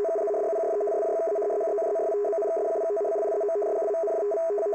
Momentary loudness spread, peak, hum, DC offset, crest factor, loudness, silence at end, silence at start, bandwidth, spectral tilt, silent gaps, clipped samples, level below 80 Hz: 0 LU; -20 dBFS; none; under 0.1%; 6 dB; -27 LUFS; 0 s; 0 s; 8.2 kHz; -5 dB/octave; none; under 0.1%; -78 dBFS